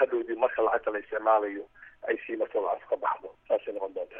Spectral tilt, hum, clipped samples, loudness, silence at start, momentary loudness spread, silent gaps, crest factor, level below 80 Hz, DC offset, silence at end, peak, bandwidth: -2 dB/octave; none; under 0.1%; -29 LUFS; 0 s; 10 LU; none; 18 dB; -68 dBFS; under 0.1%; 0 s; -10 dBFS; 3.7 kHz